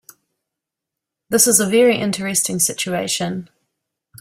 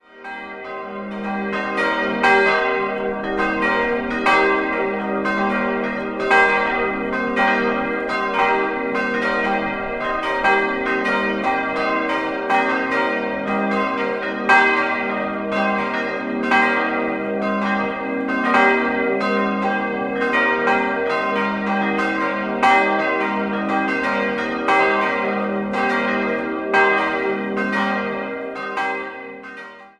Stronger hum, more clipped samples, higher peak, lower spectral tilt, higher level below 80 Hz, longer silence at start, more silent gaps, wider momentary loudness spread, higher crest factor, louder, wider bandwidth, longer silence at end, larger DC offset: neither; neither; about the same, 0 dBFS vs -2 dBFS; second, -3 dB/octave vs -5.5 dB/octave; second, -60 dBFS vs -50 dBFS; first, 1.3 s vs 0.15 s; neither; about the same, 9 LU vs 8 LU; about the same, 20 dB vs 18 dB; first, -16 LUFS vs -19 LUFS; first, 16 kHz vs 10.5 kHz; first, 0.75 s vs 0.1 s; neither